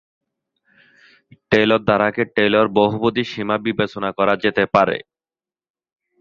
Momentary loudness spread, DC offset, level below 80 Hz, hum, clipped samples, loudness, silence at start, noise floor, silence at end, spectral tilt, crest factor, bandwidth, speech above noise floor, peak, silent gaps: 6 LU; under 0.1%; -54 dBFS; none; under 0.1%; -18 LUFS; 1.5 s; under -90 dBFS; 1.2 s; -7 dB/octave; 20 dB; 7.2 kHz; over 72 dB; 0 dBFS; none